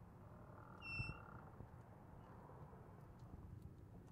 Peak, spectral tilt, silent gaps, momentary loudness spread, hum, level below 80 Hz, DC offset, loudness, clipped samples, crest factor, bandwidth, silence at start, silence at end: -34 dBFS; -6.5 dB/octave; none; 13 LU; none; -66 dBFS; under 0.1%; -56 LUFS; under 0.1%; 22 dB; 15.5 kHz; 0 s; 0 s